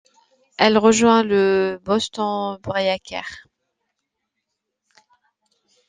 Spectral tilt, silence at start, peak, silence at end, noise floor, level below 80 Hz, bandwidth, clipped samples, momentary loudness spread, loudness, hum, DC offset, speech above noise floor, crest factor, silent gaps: -4 dB/octave; 0.6 s; 0 dBFS; 2.5 s; -79 dBFS; -58 dBFS; 9.6 kHz; under 0.1%; 16 LU; -18 LUFS; none; under 0.1%; 60 dB; 20 dB; none